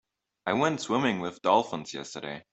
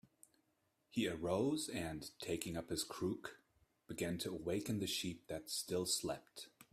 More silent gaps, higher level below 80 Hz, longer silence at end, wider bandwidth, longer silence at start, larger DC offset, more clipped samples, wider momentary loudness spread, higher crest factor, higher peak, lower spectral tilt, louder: neither; about the same, -68 dBFS vs -70 dBFS; about the same, 0.1 s vs 0.1 s; second, 8.4 kHz vs 16 kHz; second, 0.45 s vs 0.95 s; neither; neither; about the same, 12 LU vs 10 LU; about the same, 20 dB vs 20 dB; first, -8 dBFS vs -24 dBFS; about the same, -4.5 dB/octave vs -4 dB/octave; first, -29 LUFS vs -42 LUFS